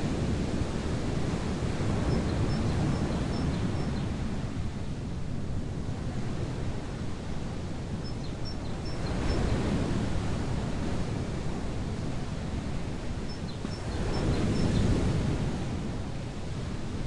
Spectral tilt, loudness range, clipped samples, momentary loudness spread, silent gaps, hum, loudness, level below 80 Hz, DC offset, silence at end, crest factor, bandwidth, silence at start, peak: -6.5 dB/octave; 5 LU; under 0.1%; 7 LU; none; none; -32 LUFS; -38 dBFS; under 0.1%; 0 s; 16 dB; 11.5 kHz; 0 s; -14 dBFS